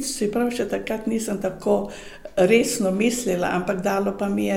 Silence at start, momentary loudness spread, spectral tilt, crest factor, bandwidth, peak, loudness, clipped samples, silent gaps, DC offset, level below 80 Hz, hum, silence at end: 0 s; 8 LU; -4.5 dB/octave; 18 dB; 17 kHz; -6 dBFS; -23 LUFS; under 0.1%; none; under 0.1%; -48 dBFS; none; 0 s